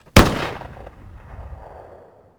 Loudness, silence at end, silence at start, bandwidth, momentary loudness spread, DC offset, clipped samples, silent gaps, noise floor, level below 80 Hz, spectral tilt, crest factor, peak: -18 LUFS; 0.85 s; 0.15 s; over 20 kHz; 27 LU; under 0.1%; 0.1%; none; -46 dBFS; -30 dBFS; -5 dB/octave; 22 dB; 0 dBFS